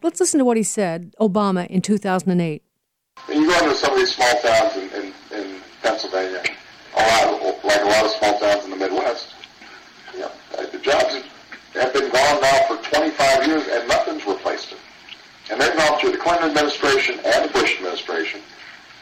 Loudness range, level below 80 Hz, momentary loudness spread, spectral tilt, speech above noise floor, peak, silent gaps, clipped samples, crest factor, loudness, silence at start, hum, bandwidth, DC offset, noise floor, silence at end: 4 LU; -52 dBFS; 18 LU; -3.5 dB/octave; 56 dB; -6 dBFS; none; under 0.1%; 14 dB; -19 LUFS; 0.05 s; none; 16 kHz; under 0.1%; -75 dBFS; 0.25 s